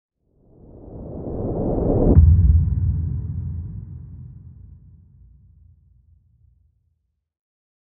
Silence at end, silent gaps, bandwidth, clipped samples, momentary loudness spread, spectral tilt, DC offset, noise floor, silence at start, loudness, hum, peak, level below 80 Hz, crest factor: 3.2 s; none; 1.6 kHz; under 0.1%; 25 LU; -13.5 dB/octave; under 0.1%; -71 dBFS; 0.75 s; -20 LUFS; none; 0 dBFS; -26 dBFS; 22 dB